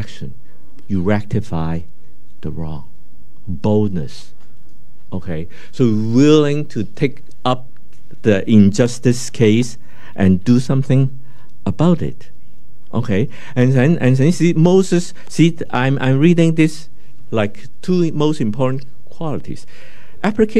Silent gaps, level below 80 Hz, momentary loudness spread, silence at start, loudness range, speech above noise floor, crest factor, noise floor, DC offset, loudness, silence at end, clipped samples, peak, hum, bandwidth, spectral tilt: none; -46 dBFS; 16 LU; 0 s; 9 LU; 34 dB; 18 dB; -50 dBFS; 10%; -16 LUFS; 0 s; under 0.1%; 0 dBFS; none; 12.5 kHz; -7 dB/octave